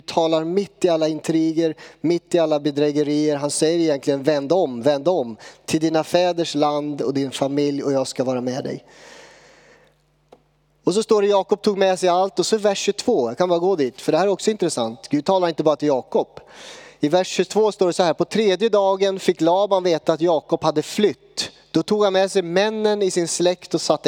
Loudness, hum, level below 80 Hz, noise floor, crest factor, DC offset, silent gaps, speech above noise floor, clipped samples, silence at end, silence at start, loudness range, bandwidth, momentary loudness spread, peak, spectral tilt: -20 LUFS; none; -66 dBFS; -60 dBFS; 18 dB; under 0.1%; none; 40 dB; under 0.1%; 0 s; 0.1 s; 5 LU; 16.5 kHz; 6 LU; -2 dBFS; -4.5 dB/octave